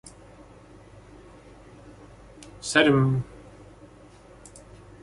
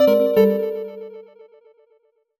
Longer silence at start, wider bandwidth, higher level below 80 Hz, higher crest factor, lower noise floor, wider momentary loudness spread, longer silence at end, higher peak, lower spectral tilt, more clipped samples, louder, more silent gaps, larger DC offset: first, 2.65 s vs 0 s; second, 11.5 kHz vs 17 kHz; first, -54 dBFS vs -64 dBFS; first, 26 dB vs 18 dB; second, -50 dBFS vs -62 dBFS; first, 29 LU vs 21 LU; first, 1.8 s vs 1.2 s; about the same, -4 dBFS vs -4 dBFS; second, -5.5 dB/octave vs -7.5 dB/octave; neither; second, -22 LUFS vs -18 LUFS; neither; neither